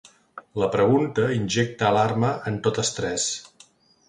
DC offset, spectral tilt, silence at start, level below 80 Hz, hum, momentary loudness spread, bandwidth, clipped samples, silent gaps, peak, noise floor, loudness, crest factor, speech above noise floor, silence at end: under 0.1%; -4.5 dB/octave; 0.35 s; -56 dBFS; none; 7 LU; 11 kHz; under 0.1%; none; -6 dBFS; -55 dBFS; -23 LUFS; 18 dB; 33 dB; 0.65 s